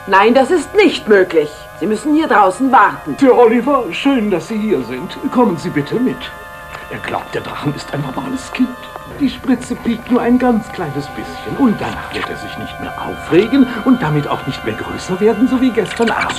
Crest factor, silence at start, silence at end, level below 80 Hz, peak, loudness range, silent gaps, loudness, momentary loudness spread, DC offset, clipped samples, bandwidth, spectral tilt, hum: 14 dB; 0 s; 0 s; -42 dBFS; 0 dBFS; 8 LU; none; -15 LUFS; 14 LU; under 0.1%; under 0.1%; 14.5 kHz; -6 dB/octave; none